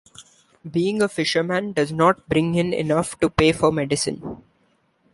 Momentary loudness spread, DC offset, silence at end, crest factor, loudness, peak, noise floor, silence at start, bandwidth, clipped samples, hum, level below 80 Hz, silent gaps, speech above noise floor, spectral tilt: 9 LU; under 0.1%; 0.75 s; 20 dB; -21 LUFS; -2 dBFS; -64 dBFS; 0.2 s; 11.5 kHz; under 0.1%; none; -46 dBFS; none; 43 dB; -5 dB/octave